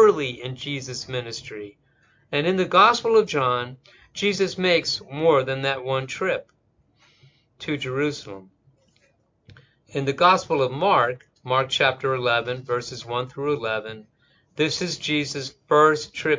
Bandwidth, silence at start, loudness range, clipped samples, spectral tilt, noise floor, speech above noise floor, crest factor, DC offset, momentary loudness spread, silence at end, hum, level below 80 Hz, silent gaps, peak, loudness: 7.6 kHz; 0 s; 8 LU; under 0.1%; -4.5 dB/octave; -65 dBFS; 42 dB; 20 dB; under 0.1%; 16 LU; 0 s; none; -60 dBFS; none; -4 dBFS; -22 LUFS